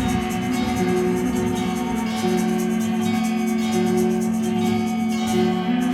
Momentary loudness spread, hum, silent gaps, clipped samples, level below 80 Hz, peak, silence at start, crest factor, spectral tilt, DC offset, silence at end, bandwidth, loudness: 3 LU; none; none; under 0.1%; -44 dBFS; -8 dBFS; 0 s; 12 dB; -5.5 dB/octave; under 0.1%; 0 s; 15.5 kHz; -22 LUFS